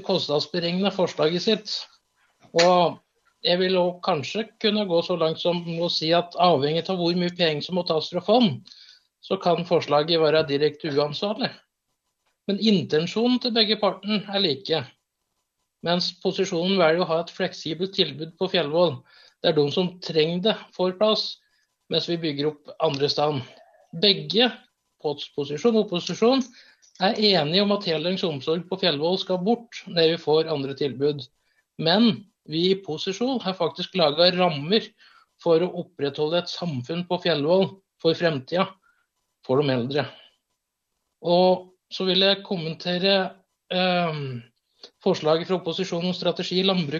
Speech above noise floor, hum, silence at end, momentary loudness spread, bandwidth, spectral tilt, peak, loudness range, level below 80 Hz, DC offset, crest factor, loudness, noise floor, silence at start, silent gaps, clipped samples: 56 dB; none; 0 s; 10 LU; 7.6 kHz; -5.5 dB/octave; -4 dBFS; 2 LU; -72 dBFS; under 0.1%; 20 dB; -23 LUFS; -79 dBFS; 0 s; none; under 0.1%